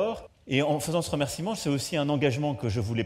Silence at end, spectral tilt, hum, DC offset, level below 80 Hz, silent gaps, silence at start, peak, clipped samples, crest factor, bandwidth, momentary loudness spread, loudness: 0 s; -5.5 dB/octave; none; under 0.1%; -54 dBFS; none; 0 s; -8 dBFS; under 0.1%; 18 dB; 16 kHz; 4 LU; -28 LUFS